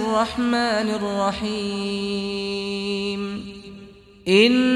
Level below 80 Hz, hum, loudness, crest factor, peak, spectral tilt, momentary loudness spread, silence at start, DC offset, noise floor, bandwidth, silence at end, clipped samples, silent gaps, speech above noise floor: -52 dBFS; none; -22 LUFS; 18 dB; -4 dBFS; -5 dB/octave; 16 LU; 0 s; under 0.1%; -45 dBFS; 12 kHz; 0 s; under 0.1%; none; 23 dB